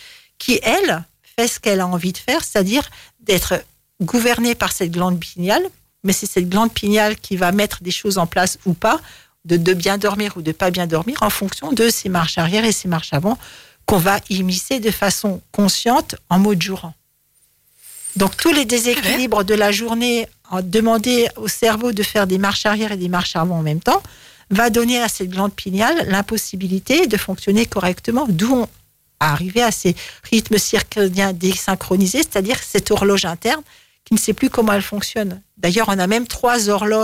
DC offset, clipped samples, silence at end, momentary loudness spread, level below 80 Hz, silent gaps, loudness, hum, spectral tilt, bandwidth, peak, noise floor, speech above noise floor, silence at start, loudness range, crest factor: 0.2%; under 0.1%; 0 s; 6 LU; -44 dBFS; none; -18 LUFS; none; -4 dB/octave; 16.5 kHz; -4 dBFS; -59 dBFS; 42 dB; 0 s; 2 LU; 14 dB